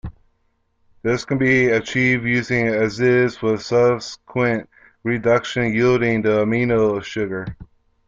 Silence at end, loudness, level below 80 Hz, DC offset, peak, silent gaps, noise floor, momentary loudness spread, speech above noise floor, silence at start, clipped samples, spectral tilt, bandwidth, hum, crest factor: 0.4 s; -19 LUFS; -48 dBFS; under 0.1%; -4 dBFS; none; -66 dBFS; 9 LU; 47 dB; 0.05 s; under 0.1%; -6.5 dB/octave; 7.6 kHz; none; 16 dB